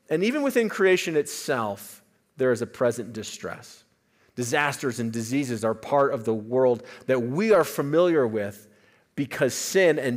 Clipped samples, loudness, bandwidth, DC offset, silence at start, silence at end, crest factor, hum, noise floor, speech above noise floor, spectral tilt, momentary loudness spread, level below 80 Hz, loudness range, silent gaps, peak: under 0.1%; -24 LUFS; 16 kHz; under 0.1%; 0.1 s; 0 s; 18 dB; none; -64 dBFS; 40 dB; -5 dB/octave; 14 LU; -70 dBFS; 5 LU; none; -6 dBFS